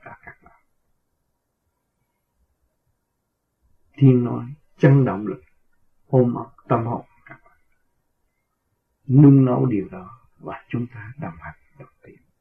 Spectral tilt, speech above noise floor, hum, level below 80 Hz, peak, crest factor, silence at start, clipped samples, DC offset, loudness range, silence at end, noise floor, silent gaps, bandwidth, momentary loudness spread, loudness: -11.5 dB/octave; 57 dB; none; -58 dBFS; -2 dBFS; 20 dB; 0.05 s; under 0.1%; under 0.1%; 6 LU; 0.6 s; -75 dBFS; none; 3.4 kHz; 23 LU; -19 LUFS